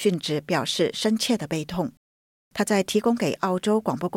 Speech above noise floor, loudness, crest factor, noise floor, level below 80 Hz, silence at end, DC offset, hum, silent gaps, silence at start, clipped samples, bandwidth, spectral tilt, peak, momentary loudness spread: over 66 dB; -24 LUFS; 16 dB; under -90 dBFS; -60 dBFS; 0 s; under 0.1%; none; 1.97-2.51 s; 0 s; under 0.1%; 16.5 kHz; -4.5 dB/octave; -8 dBFS; 7 LU